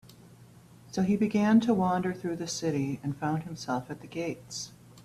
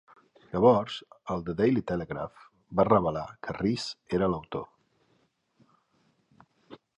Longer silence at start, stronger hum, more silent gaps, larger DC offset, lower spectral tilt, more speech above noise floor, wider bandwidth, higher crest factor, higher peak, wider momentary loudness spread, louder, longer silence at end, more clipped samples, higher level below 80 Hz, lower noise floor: second, 0.4 s vs 0.55 s; neither; neither; neither; about the same, -6 dB/octave vs -7 dB/octave; second, 25 dB vs 43 dB; first, 13.5 kHz vs 11 kHz; about the same, 18 dB vs 22 dB; second, -12 dBFS vs -8 dBFS; about the same, 14 LU vs 16 LU; about the same, -30 LUFS vs -28 LUFS; second, 0.05 s vs 0.2 s; neither; second, -64 dBFS vs -56 dBFS; second, -54 dBFS vs -71 dBFS